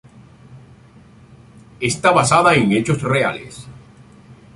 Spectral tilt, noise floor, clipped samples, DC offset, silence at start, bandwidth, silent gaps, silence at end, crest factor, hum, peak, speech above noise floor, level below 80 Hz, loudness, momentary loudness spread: -4.5 dB/octave; -46 dBFS; under 0.1%; under 0.1%; 0.5 s; 11.5 kHz; none; 0.25 s; 20 dB; none; 0 dBFS; 30 dB; -50 dBFS; -16 LUFS; 19 LU